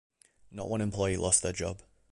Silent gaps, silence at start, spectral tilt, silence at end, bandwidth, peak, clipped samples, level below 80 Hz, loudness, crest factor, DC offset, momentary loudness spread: none; 0.5 s; -4 dB/octave; 0.35 s; 11.5 kHz; -10 dBFS; under 0.1%; -50 dBFS; -30 LUFS; 24 dB; under 0.1%; 19 LU